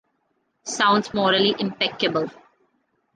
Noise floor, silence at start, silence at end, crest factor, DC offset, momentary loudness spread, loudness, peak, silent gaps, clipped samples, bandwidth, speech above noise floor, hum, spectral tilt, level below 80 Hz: -71 dBFS; 0.65 s; 0.85 s; 18 dB; under 0.1%; 13 LU; -21 LUFS; -6 dBFS; none; under 0.1%; 10 kHz; 50 dB; none; -3.5 dB/octave; -64 dBFS